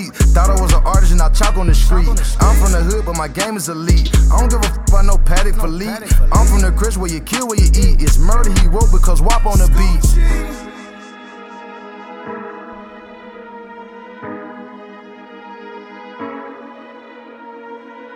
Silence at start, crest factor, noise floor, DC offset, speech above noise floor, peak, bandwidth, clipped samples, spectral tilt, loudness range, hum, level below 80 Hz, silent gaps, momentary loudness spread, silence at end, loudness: 0 s; 12 dB; -37 dBFS; under 0.1%; 26 dB; 0 dBFS; 15.5 kHz; under 0.1%; -5 dB/octave; 18 LU; none; -14 dBFS; none; 22 LU; 0 s; -15 LUFS